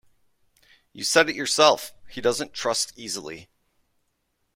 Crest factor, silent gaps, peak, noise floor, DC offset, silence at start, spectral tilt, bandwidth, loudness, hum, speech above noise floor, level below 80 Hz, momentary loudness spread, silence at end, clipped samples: 24 dB; none; -2 dBFS; -74 dBFS; under 0.1%; 0.95 s; -1.5 dB/octave; 16.5 kHz; -23 LUFS; none; 50 dB; -62 dBFS; 16 LU; 1.1 s; under 0.1%